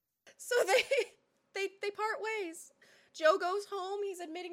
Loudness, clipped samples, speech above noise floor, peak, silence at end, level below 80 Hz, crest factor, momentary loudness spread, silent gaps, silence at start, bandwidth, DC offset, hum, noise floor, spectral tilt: -34 LUFS; under 0.1%; 20 dB; -14 dBFS; 0 s; -86 dBFS; 20 dB; 15 LU; none; 0.25 s; 16.5 kHz; under 0.1%; none; -53 dBFS; -0.5 dB/octave